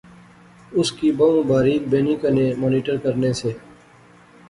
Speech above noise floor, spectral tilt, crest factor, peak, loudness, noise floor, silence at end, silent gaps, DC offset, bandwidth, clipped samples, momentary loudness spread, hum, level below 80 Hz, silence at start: 30 dB; -6.5 dB/octave; 16 dB; -4 dBFS; -20 LUFS; -49 dBFS; 0.9 s; none; under 0.1%; 11.5 kHz; under 0.1%; 9 LU; none; -52 dBFS; 0.7 s